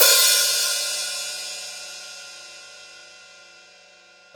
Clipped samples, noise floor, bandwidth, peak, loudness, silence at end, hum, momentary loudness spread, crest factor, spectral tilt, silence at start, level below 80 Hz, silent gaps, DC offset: under 0.1%; -51 dBFS; over 20 kHz; -2 dBFS; -19 LUFS; 1.2 s; none; 26 LU; 24 dB; 3.5 dB/octave; 0 s; -76 dBFS; none; under 0.1%